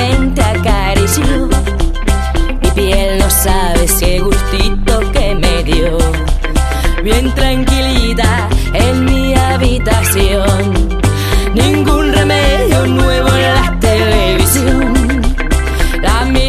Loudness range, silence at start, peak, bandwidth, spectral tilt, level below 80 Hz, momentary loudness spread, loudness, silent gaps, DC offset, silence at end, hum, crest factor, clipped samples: 2 LU; 0 s; 0 dBFS; 14.5 kHz; -4.5 dB/octave; -14 dBFS; 4 LU; -12 LUFS; none; under 0.1%; 0 s; none; 10 dB; under 0.1%